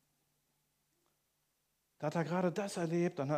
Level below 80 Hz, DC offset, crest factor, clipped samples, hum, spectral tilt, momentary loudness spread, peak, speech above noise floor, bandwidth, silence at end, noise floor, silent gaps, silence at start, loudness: -84 dBFS; under 0.1%; 18 dB; under 0.1%; none; -6.5 dB/octave; 4 LU; -22 dBFS; 46 dB; 15 kHz; 0 s; -81 dBFS; none; 2 s; -36 LUFS